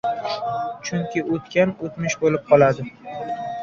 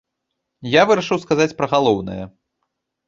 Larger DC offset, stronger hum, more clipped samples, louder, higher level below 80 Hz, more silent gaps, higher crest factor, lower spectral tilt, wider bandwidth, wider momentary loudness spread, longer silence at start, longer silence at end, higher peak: neither; neither; neither; second, -22 LUFS vs -17 LUFS; second, -58 dBFS vs -52 dBFS; neither; about the same, 18 dB vs 18 dB; about the same, -5.5 dB/octave vs -5 dB/octave; about the same, 7.4 kHz vs 7.6 kHz; second, 13 LU vs 18 LU; second, 0.05 s vs 0.6 s; second, 0 s vs 0.8 s; about the same, -4 dBFS vs -2 dBFS